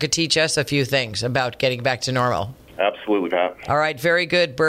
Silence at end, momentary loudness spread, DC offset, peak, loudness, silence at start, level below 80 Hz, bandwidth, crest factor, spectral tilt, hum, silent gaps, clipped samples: 0 s; 5 LU; under 0.1%; -6 dBFS; -20 LUFS; 0 s; -52 dBFS; 16 kHz; 16 dB; -3.5 dB/octave; none; none; under 0.1%